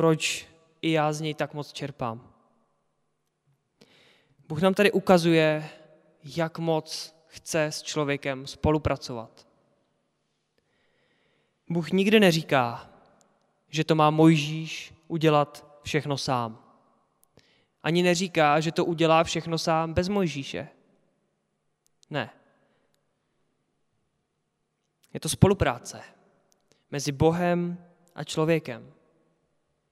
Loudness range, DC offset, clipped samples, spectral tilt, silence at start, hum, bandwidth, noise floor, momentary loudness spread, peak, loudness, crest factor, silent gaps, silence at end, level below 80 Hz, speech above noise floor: 13 LU; under 0.1%; under 0.1%; -5.5 dB/octave; 0 s; none; 14.5 kHz; -77 dBFS; 17 LU; -2 dBFS; -25 LUFS; 24 dB; none; 1.05 s; -52 dBFS; 52 dB